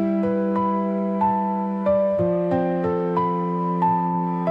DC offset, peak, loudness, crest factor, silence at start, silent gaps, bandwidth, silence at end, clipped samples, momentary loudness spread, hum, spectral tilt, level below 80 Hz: under 0.1%; -10 dBFS; -22 LUFS; 12 dB; 0 s; none; 5 kHz; 0 s; under 0.1%; 3 LU; none; -10.5 dB/octave; -58 dBFS